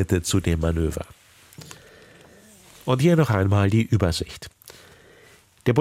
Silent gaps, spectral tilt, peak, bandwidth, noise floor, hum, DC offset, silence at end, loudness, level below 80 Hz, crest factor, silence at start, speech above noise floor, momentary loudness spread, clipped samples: none; -6 dB/octave; -6 dBFS; 15.5 kHz; -53 dBFS; none; under 0.1%; 0 s; -22 LUFS; -40 dBFS; 18 dB; 0 s; 32 dB; 23 LU; under 0.1%